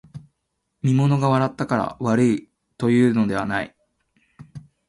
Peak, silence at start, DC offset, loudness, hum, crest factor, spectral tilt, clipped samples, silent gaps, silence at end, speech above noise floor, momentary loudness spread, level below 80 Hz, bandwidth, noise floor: -6 dBFS; 0.15 s; under 0.1%; -21 LUFS; none; 16 dB; -7.5 dB/octave; under 0.1%; none; 0.3 s; 56 dB; 8 LU; -56 dBFS; 11.5 kHz; -76 dBFS